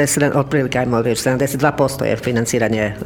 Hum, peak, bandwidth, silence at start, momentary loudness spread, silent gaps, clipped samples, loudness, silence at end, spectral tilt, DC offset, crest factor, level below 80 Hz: none; -2 dBFS; 19 kHz; 0 s; 2 LU; none; under 0.1%; -17 LUFS; 0 s; -5 dB/octave; under 0.1%; 16 dB; -44 dBFS